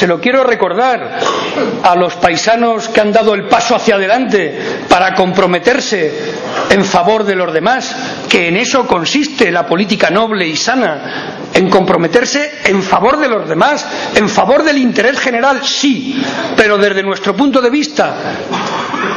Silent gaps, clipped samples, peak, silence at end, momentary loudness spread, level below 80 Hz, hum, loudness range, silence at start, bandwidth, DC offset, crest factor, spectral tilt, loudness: none; 0.6%; 0 dBFS; 0 s; 6 LU; -46 dBFS; none; 1 LU; 0 s; 11 kHz; under 0.1%; 12 dB; -4 dB/octave; -11 LUFS